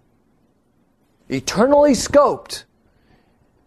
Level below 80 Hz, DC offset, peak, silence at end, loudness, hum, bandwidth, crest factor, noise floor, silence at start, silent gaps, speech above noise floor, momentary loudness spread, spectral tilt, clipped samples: -48 dBFS; under 0.1%; -2 dBFS; 1.05 s; -16 LUFS; none; 13 kHz; 18 dB; -62 dBFS; 1.3 s; none; 46 dB; 16 LU; -4.5 dB/octave; under 0.1%